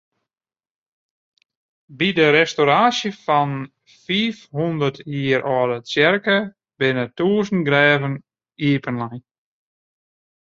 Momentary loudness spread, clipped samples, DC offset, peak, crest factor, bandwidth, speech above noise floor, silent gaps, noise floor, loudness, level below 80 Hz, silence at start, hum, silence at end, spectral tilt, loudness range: 12 LU; under 0.1%; under 0.1%; -2 dBFS; 20 dB; 7.6 kHz; over 71 dB; none; under -90 dBFS; -19 LUFS; -62 dBFS; 1.9 s; none; 1.25 s; -5.5 dB/octave; 2 LU